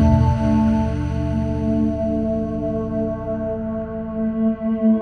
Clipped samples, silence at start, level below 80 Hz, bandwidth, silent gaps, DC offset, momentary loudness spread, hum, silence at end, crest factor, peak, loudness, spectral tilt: under 0.1%; 0 s; -30 dBFS; 6.4 kHz; none; under 0.1%; 7 LU; none; 0 s; 16 dB; -4 dBFS; -21 LUFS; -9.5 dB/octave